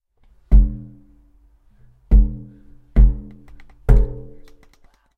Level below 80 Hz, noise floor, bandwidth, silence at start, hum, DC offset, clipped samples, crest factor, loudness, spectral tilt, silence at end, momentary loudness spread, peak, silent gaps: -18 dBFS; -54 dBFS; 2.3 kHz; 0.5 s; none; under 0.1%; under 0.1%; 18 dB; -20 LUFS; -10.5 dB/octave; 1 s; 19 LU; 0 dBFS; none